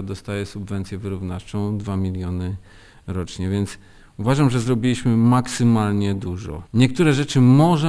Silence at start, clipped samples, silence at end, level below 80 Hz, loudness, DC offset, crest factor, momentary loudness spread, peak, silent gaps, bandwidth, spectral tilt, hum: 0 s; under 0.1%; 0 s; -44 dBFS; -21 LUFS; under 0.1%; 18 dB; 13 LU; -2 dBFS; none; 11 kHz; -7 dB/octave; none